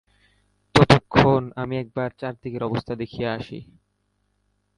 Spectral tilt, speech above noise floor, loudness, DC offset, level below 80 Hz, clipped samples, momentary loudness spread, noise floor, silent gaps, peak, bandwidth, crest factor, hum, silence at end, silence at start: -6.5 dB/octave; 43 dB; -22 LUFS; under 0.1%; -46 dBFS; under 0.1%; 16 LU; -71 dBFS; none; 0 dBFS; 11.5 kHz; 24 dB; 50 Hz at -55 dBFS; 1.15 s; 0.75 s